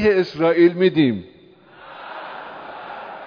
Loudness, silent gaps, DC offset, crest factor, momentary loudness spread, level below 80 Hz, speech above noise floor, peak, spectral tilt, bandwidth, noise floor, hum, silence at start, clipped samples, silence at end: -17 LUFS; none; under 0.1%; 16 dB; 20 LU; -54 dBFS; 31 dB; -4 dBFS; -8 dB/octave; 5.4 kHz; -48 dBFS; none; 0 s; under 0.1%; 0 s